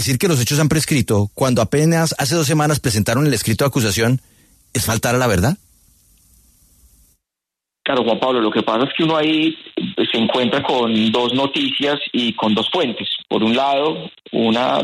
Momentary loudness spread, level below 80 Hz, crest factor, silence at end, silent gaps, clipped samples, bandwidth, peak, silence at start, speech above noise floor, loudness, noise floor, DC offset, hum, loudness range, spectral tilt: 5 LU; -46 dBFS; 14 dB; 0 s; none; under 0.1%; 14 kHz; -4 dBFS; 0 s; 67 dB; -17 LUFS; -84 dBFS; under 0.1%; none; 6 LU; -4.5 dB/octave